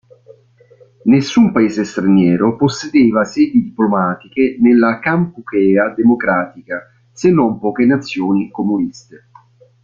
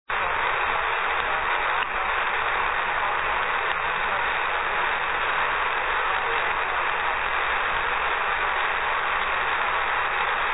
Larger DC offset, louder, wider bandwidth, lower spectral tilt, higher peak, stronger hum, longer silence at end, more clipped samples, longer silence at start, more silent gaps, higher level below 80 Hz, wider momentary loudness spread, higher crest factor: second, under 0.1% vs 0.8%; first, -14 LUFS vs -23 LUFS; first, 7.4 kHz vs 4.1 kHz; first, -7 dB/octave vs -5.5 dB/octave; first, -2 dBFS vs -10 dBFS; neither; first, 0.9 s vs 0 s; neither; first, 1.05 s vs 0.05 s; neither; second, -52 dBFS vs -46 dBFS; first, 8 LU vs 1 LU; about the same, 12 dB vs 16 dB